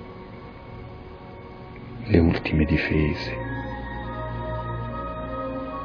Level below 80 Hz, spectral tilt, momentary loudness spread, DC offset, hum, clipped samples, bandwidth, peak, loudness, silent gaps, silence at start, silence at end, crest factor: -36 dBFS; -9 dB/octave; 20 LU; under 0.1%; none; under 0.1%; 5.4 kHz; -2 dBFS; -26 LUFS; none; 0 s; 0 s; 24 dB